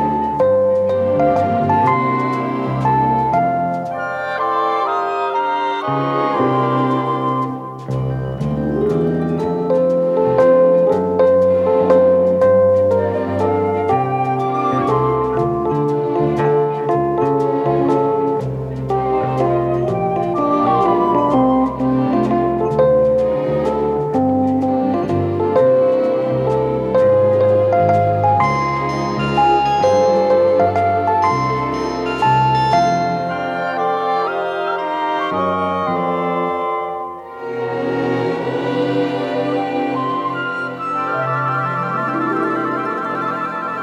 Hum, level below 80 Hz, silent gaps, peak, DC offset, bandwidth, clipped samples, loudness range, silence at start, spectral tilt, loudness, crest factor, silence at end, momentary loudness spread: none; -46 dBFS; none; -2 dBFS; under 0.1%; 8 kHz; under 0.1%; 5 LU; 0 s; -8 dB/octave; -17 LUFS; 14 dB; 0 s; 7 LU